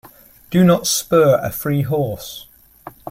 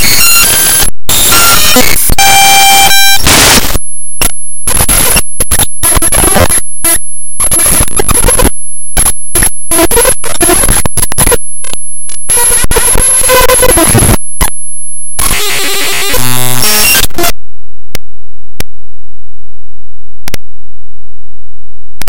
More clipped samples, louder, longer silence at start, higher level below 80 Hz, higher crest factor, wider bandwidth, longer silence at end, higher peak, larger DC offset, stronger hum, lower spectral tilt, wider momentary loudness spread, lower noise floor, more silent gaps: second, under 0.1% vs 5%; second, -16 LUFS vs -6 LUFS; first, 0.5 s vs 0 s; second, -50 dBFS vs -18 dBFS; first, 16 dB vs 4 dB; second, 16.5 kHz vs over 20 kHz; about the same, 0 s vs 0 s; about the same, -2 dBFS vs 0 dBFS; neither; neither; first, -5.5 dB/octave vs -1.5 dB/octave; first, 18 LU vs 14 LU; about the same, -41 dBFS vs -40 dBFS; neither